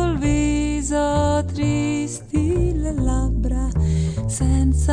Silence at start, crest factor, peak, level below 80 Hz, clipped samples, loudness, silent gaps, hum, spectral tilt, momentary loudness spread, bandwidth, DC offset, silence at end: 0 s; 12 dB; -8 dBFS; -24 dBFS; under 0.1%; -21 LUFS; none; none; -6.5 dB/octave; 4 LU; 10 kHz; under 0.1%; 0 s